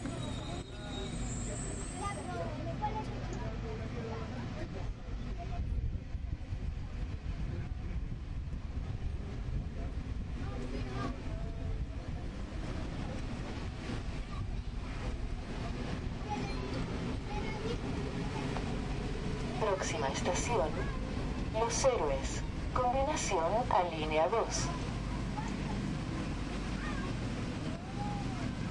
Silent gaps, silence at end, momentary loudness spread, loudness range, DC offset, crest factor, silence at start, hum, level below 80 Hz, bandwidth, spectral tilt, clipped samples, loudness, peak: none; 0 s; 10 LU; 8 LU; under 0.1%; 20 dB; 0 s; none; -42 dBFS; 11 kHz; -5.5 dB/octave; under 0.1%; -37 LUFS; -16 dBFS